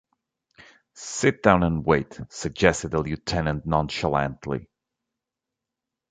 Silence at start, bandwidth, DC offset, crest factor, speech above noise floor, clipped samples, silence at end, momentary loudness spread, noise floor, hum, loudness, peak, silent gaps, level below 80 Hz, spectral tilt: 0.95 s; 9.4 kHz; under 0.1%; 24 dB; 63 dB; under 0.1%; 1.45 s; 13 LU; -86 dBFS; none; -24 LUFS; -2 dBFS; none; -44 dBFS; -5.5 dB/octave